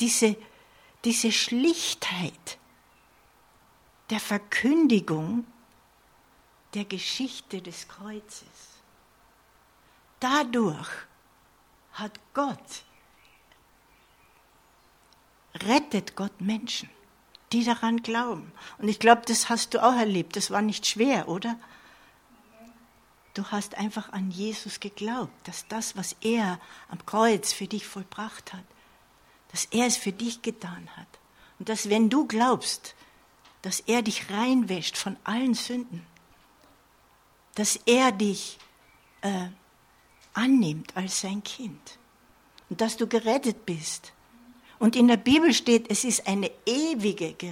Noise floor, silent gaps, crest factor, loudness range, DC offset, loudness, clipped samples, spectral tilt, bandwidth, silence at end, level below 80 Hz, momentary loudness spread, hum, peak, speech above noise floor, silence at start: -61 dBFS; none; 24 dB; 11 LU; under 0.1%; -26 LUFS; under 0.1%; -3.5 dB/octave; 16.5 kHz; 0 s; -68 dBFS; 18 LU; none; -4 dBFS; 34 dB; 0 s